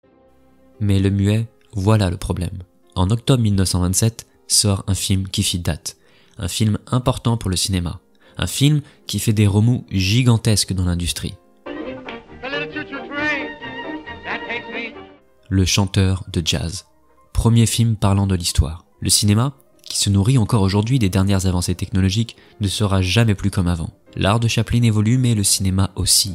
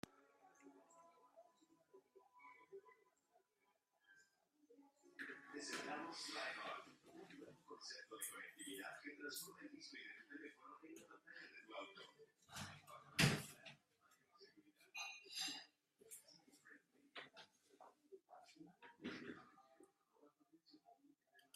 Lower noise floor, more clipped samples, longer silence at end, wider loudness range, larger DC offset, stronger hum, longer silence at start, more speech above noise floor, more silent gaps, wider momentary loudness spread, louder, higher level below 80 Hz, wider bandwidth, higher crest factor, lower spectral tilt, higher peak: second, -53 dBFS vs -85 dBFS; neither; about the same, 0 s vs 0.1 s; second, 5 LU vs 21 LU; neither; neither; first, 0.8 s vs 0.05 s; about the same, 35 dB vs 32 dB; neither; second, 14 LU vs 20 LU; first, -19 LUFS vs -50 LUFS; first, -38 dBFS vs -82 dBFS; first, 16 kHz vs 14.5 kHz; second, 18 dB vs 32 dB; about the same, -4.5 dB/octave vs -3.5 dB/octave; first, 0 dBFS vs -22 dBFS